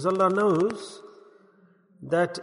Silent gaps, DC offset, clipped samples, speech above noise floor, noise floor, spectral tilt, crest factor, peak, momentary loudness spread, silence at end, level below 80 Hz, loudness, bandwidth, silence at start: none; under 0.1%; under 0.1%; 35 dB; -59 dBFS; -6.5 dB/octave; 16 dB; -10 dBFS; 23 LU; 0 s; -70 dBFS; -24 LUFS; 11 kHz; 0 s